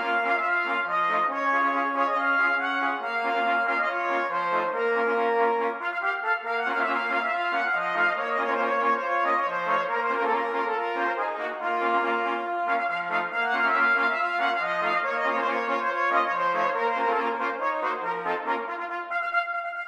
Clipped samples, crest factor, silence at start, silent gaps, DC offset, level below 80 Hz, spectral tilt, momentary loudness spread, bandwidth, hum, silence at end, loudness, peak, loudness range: under 0.1%; 16 dB; 0 s; none; under 0.1%; -78 dBFS; -4 dB/octave; 4 LU; 14 kHz; none; 0 s; -25 LUFS; -10 dBFS; 2 LU